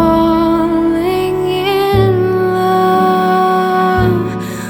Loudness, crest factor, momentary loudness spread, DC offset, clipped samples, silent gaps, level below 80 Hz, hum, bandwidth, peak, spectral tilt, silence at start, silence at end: -13 LUFS; 12 dB; 4 LU; under 0.1%; under 0.1%; none; -34 dBFS; none; over 20 kHz; 0 dBFS; -7 dB/octave; 0 s; 0 s